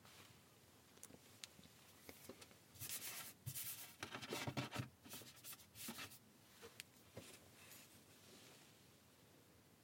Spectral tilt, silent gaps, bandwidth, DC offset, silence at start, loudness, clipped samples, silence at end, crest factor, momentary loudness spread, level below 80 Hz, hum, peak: -3 dB/octave; none; 17 kHz; under 0.1%; 0 s; -53 LUFS; under 0.1%; 0 s; 28 dB; 19 LU; -82 dBFS; none; -28 dBFS